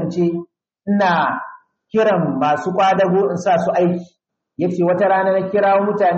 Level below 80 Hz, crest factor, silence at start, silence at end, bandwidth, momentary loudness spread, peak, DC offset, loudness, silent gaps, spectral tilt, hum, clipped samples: -64 dBFS; 12 dB; 0 s; 0 s; 8 kHz; 8 LU; -6 dBFS; under 0.1%; -17 LUFS; none; -7 dB/octave; none; under 0.1%